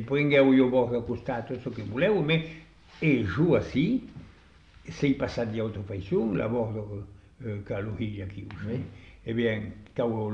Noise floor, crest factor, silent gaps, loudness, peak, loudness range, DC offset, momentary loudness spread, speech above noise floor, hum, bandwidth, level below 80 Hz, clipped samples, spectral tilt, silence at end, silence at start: -54 dBFS; 18 dB; none; -27 LUFS; -10 dBFS; 7 LU; under 0.1%; 18 LU; 27 dB; none; 7.2 kHz; -52 dBFS; under 0.1%; -8 dB/octave; 0 s; 0 s